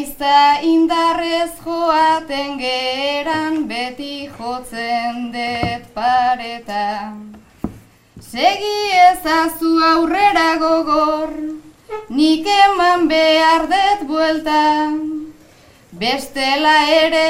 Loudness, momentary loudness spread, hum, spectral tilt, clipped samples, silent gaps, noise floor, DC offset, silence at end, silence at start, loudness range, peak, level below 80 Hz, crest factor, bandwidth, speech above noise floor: -16 LUFS; 15 LU; none; -3.5 dB/octave; under 0.1%; none; -47 dBFS; under 0.1%; 0 s; 0 s; 7 LU; 0 dBFS; -46 dBFS; 16 dB; 16 kHz; 31 dB